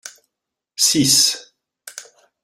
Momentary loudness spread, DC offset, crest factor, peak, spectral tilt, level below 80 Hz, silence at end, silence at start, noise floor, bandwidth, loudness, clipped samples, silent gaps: 24 LU; under 0.1%; 20 dB; -2 dBFS; -1.5 dB/octave; -60 dBFS; 0.4 s; 0.05 s; -83 dBFS; 16 kHz; -14 LUFS; under 0.1%; none